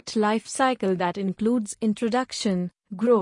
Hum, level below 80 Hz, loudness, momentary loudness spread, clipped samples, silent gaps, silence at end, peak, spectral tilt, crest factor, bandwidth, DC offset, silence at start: none; -64 dBFS; -25 LUFS; 4 LU; under 0.1%; none; 0 s; -8 dBFS; -5 dB/octave; 16 dB; 11 kHz; under 0.1%; 0.05 s